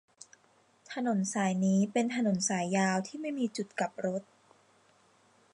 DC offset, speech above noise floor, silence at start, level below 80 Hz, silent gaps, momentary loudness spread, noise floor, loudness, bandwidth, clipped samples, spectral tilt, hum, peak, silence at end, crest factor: under 0.1%; 36 dB; 0.9 s; -80 dBFS; none; 8 LU; -67 dBFS; -31 LUFS; 11 kHz; under 0.1%; -5 dB/octave; none; -16 dBFS; 1.3 s; 18 dB